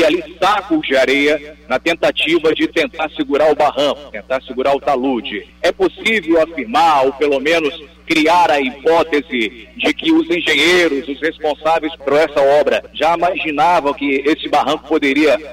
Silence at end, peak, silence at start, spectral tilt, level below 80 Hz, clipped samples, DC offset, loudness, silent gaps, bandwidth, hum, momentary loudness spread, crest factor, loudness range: 0 s; -6 dBFS; 0 s; -4 dB/octave; -46 dBFS; under 0.1%; under 0.1%; -15 LUFS; none; 16 kHz; none; 7 LU; 10 dB; 2 LU